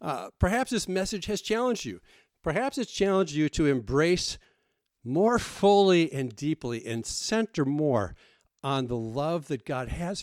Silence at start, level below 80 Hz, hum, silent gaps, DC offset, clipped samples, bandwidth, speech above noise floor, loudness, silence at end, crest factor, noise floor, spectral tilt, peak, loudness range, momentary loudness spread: 0 s; -46 dBFS; none; none; under 0.1%; under 0.1%; 15.5 kHz; 49 dB; -27 LUFS; 0 s; 18 dB; -76 dBFS; -5 dB/octave; -10 dBFS; 4 LU; 10 LU